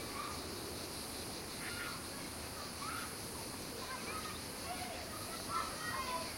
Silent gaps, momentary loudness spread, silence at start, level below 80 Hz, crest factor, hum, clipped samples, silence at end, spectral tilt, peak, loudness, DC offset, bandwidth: none; 4 LU; 0 s; -60 dBFS; 18 dB; none; under 0.1%; 0 s; -2.5 dB/octave; -26 dBFS; -42 LUFS; under 0.1%; 16.5 kHz